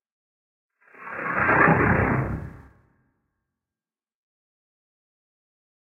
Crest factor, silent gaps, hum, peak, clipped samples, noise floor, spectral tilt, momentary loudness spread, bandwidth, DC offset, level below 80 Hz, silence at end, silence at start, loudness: 22 dB; none; none; -6 dBFS; under 0.1%; under -90 dBFS; -10 dB/octave; 21 LU; 4.9 kHz; under 0.1%; -44 dBFS; 3.4 s; 1 s; -21 LUFS